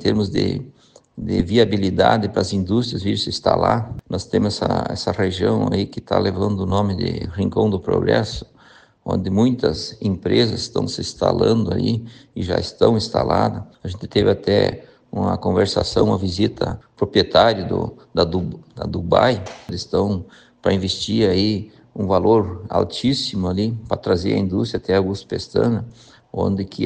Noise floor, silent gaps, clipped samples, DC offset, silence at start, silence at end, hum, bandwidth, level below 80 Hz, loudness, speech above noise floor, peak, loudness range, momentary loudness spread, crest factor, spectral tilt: -50 dBFS; none; under 0.1%; under 0.1%; 0 s; 0 s; none; 9.6 kHz; -44 dBFS; -20 LUFS; 31 dB; 0 dBFS; 2 LU; 10 LU; 20 dB; -6.5 dB/octave